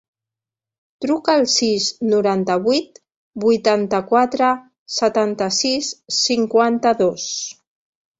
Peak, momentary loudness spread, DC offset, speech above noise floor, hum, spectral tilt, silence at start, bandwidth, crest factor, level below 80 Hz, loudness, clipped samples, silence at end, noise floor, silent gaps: -2 dBFS; 9 LU; under 0.1%; 70 dB; none; -3 dB/octave; 1 s; 8 kHz; 18 dB; -62 dBFS; -18 LUFS; under 0.1%; 0.65 s; -88 dBFS; 3.16-3.31 s, 4.79-4.86 s